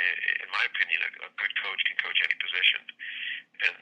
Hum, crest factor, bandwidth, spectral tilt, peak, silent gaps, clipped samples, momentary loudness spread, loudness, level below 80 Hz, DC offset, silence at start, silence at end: none; 24 dB; 9.8 kHz; 1 dB/octave; -6 dBFS; none; under 0.1%; 10 LU; -27 LUFS; under -90 dBFS; under 0.1%; 0 s; 0.05 s